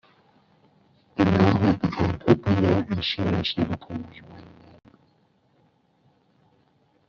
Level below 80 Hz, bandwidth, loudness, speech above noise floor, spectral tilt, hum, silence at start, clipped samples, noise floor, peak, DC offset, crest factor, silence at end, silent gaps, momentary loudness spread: -52 dBFS; 7 kHz; -23 LUFS; 36 dB; -5.5 dB/octave; none; 1.15 s; under 0.1%; -64 dBFS; -4 dBFS; under 0.1%; 22 dB; 2.65 s; none; 17 LU